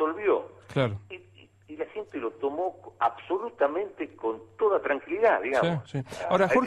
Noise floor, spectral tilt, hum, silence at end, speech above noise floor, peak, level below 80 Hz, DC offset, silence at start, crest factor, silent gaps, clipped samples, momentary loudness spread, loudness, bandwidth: -55 dBFS; -7 dB/octave; none; 0 s; 28 dB; -10 dBFS; -64 dBFS; under 0.1%; 0 s; 18 dB; none; under 0.1%; 12 LU; -28 LUFS; 12 kHz